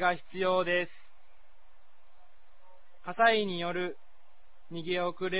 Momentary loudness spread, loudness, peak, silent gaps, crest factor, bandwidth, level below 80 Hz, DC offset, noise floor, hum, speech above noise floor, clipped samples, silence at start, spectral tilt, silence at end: 18 LU; -30 LUFS; -12 dBFS; none; 22 dB; 4 kHz; -70 dBFS; 0.9%; -64 dBFS; none; 35 dB; under 0.1%; 0 s; -2.5 dB/octave; 0 s